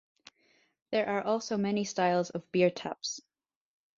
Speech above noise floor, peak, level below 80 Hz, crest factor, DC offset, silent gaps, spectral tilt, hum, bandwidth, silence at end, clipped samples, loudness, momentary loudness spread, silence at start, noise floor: 40 dB; -12 dBFS; -74 dBFS; 20 dB; under 0.1%; none; -4.5 dB/octave; none; 7.8 kHz; 0.8 s; under 0.1%; -31 LUFS; 9 LU; 0.9 s; -70 dBFS